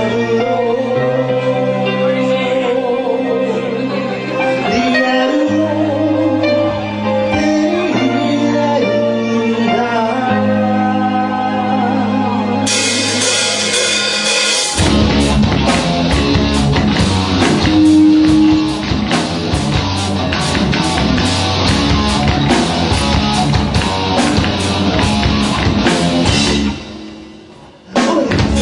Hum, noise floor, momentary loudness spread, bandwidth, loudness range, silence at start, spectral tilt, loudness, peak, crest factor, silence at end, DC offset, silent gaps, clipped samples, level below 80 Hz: none; -38 dBFS; 4 LU; 11 kHz; 3 LU; 0 s; -4.5 dB/octave; -13 LUFS; 0 dBFS; 14 dB; 0 s; under 0.1%; none; under 0.1%; -28 dBFS